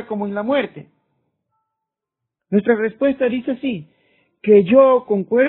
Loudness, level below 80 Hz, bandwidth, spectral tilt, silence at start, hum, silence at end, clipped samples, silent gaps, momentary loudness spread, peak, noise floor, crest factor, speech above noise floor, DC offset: -17 LUFS; -60 dBFS; 4.1 kHz; -5.5 dB/octave; 0 s; none; 0 s; under 0.1%; none; 13 LU; 0 dBFS; -83 dBFS; 18 dB; 66 dB; under 0.1%